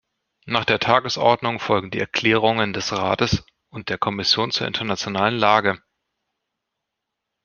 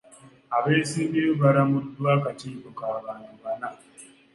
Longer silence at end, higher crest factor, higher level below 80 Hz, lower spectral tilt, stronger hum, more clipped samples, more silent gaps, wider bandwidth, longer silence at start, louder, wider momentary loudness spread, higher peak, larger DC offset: first, 1.7 s vs 0.3 s; about the same, 20 dB vs 18 dB; first, -52 dBFS vs -68 dBFS; second, -4.5 dB/octave vs -6.5 dB/octave; neither; neither; neither; second, 7.2 kHz vs 11.5 kHz; first, 0.45 s vs 0.25 s; first, -20 LUFS vs -25 LUFS; second, 7 LU vs 17 LU; first, -2 dBFS vs -6 dBFS; neither